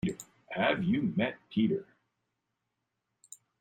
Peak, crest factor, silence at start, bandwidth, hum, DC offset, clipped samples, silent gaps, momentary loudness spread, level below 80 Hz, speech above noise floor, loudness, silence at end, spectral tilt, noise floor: -14 dBFS; 20 dB; 0.05 s; 15.5 kHz; none; under 0.1%; under 0.1%; none; 9 LU; -66 dBFS; 54 dB; -31 LUFS; 1.75 s; -6 dB/octave; -84 dBFS